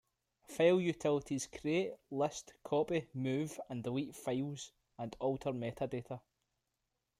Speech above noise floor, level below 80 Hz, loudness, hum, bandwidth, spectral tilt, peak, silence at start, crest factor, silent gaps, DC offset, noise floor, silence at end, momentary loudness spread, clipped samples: 50 dB; -70 dBFS; -37 LUFS; none; 15 kHz; -5.5 dB/octave; -18 dBFS; 0.5 s; 20 dB; none; under 0.1%; -86 dBFS; 1 s; 15 LU; under 0.1%